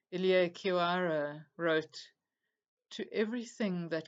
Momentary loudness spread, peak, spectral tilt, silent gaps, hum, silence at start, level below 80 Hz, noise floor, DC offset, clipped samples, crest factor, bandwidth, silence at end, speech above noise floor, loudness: 15 LU; -16 dBFS; -6 dB/octave; 2.68-2.77 s; none; 0.1 s; under -90 dBFS; -89 dBFS; under 0.1%; under 0.1%; 18 dB; 8 kHz; 0.05 s; 55 dB; -33 LUFS